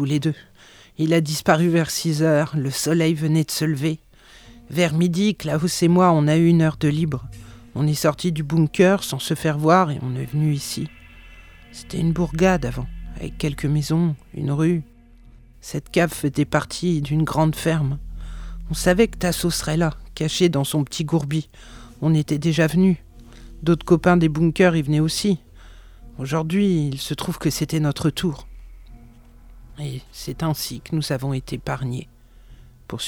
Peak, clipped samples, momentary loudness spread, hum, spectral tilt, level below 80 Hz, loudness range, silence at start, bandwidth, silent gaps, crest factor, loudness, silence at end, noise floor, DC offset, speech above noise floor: -2 dBFS; under 0.1%; 15 LU; none; -6 dB/octave; -40 dBFS; 7 LU; 0 s; 19 kHz; none; 20 dB; -21 LUFS; 0 s; -47 dBFS; under 0.1%; 27 dB